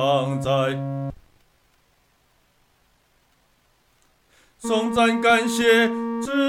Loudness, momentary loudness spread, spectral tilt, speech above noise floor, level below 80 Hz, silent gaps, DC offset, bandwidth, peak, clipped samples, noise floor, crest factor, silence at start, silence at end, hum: -21 LUFS; 13 LU; -5 dB/octave; 43 dB; -56 dBFS; none; under 0.1%; 15.5 kHz; -6 dBFS; under 0.1%; -63 dBFS; 18 dB; 0 s; 0 s; none